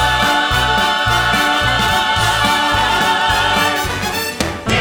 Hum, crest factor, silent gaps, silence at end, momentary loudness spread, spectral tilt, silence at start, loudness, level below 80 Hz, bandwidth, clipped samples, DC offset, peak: none; 14 dB; none; 0 s; 5 LU; -3 dB/octave; 0 s; -14 LUFS; -30 dBFS; over 20 kHz; under 0.1%; under 0.1%; 0 dBFS